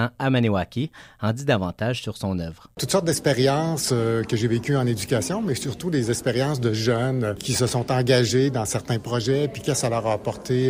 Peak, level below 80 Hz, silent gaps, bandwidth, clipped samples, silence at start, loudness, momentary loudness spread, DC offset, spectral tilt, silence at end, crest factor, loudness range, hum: -6 dBFS; -50 dBFS; none; 16 kHz; under 0.1%; 0 s; -23 LUFS; 8 LU; under 0.1%; -5 dB/octave; 0 s; 16 dB; 2 LU; none